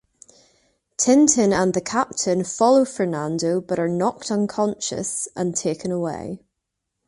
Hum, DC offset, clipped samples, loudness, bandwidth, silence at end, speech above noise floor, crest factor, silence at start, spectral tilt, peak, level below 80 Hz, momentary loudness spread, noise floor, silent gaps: none; under 0.1%; under 0.1%; -21 LUFS; 11.5 kHz; 0.7 s; 59 dB; 20 dB; 1 s; -4.5 dB/octave; -2 dBFS; -58 dBFS; 10 LU; -80 dBFS; none